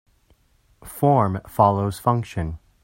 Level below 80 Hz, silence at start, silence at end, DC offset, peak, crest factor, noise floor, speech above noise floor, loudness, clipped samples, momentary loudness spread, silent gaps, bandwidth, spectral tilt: -48 dBFS; 0.85 s; 0.25 s; under 0.1%; -2 dBFS; 22 dB; -60 dBFS; 40 dB; -21 LUFS; under 0.1%; 12 LU; none; 16.5 kHz; -8 dB/octave